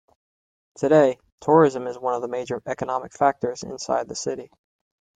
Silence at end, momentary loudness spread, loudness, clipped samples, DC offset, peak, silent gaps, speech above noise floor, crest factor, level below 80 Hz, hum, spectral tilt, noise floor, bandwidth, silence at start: 0.75 s; 12 LU; -23 LUFS; under 0.1%; under 0.1%; -4 dBFS; 1.32-1.38 s; over 68 dB; 20 dB; -64 dBFS; none; -5.5 dB/octave; under -90 dBFS; 9.4 kHz; 0.8 s